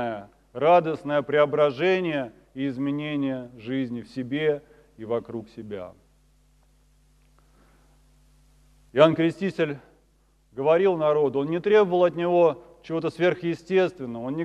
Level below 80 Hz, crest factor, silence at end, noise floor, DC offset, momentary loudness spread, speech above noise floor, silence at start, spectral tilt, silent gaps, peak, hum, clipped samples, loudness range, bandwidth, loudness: -62 dBFS; 24 dB; 0 s; -62 dBFS; under 0.1%; 17 LU; 39 dB; 0 s; -7.5 dB/octave; none; -2 dBFS; none; under 0.1%; 15 LU; 9.8 kHz; -24 LUFS